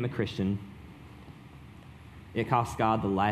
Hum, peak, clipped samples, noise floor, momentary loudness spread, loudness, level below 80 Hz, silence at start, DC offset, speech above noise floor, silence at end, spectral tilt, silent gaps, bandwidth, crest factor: none; -10 dBFS; under 0.1%; -49 dBFS; 23 LU; -30 LUFS; -54 dBFS; 0 s; under 0.1%; 21 dB; 0 s; -7 dB/octave; none; 14.5 kHz; 22 dB